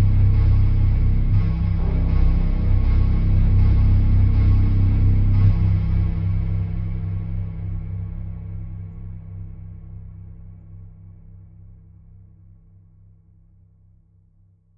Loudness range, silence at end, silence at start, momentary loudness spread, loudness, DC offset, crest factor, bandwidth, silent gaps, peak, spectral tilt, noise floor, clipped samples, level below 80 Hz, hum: 20 LU; 3.9 s; 0 s; 21 LU; -20 LUFS; under 0.1%; 14 dB; 5 kHz; none; -4 dBFS; -11 dB/octave; -56 dBFS; under 0.1%; -22 dBFS; none